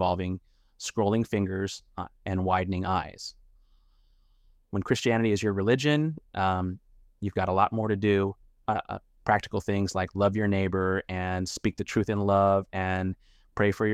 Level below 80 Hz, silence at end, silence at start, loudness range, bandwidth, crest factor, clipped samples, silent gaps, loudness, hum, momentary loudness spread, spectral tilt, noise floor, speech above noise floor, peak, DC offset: -54 dBFS; 0 s; 0 s; 4 LU; 13.5 kHz; 20 dB; under 0.1%; none; -28 LUFS; none; 12 LU; -6 dB/octave; -62 dBFS; 35 dB; -8 dBFS; under 0.1%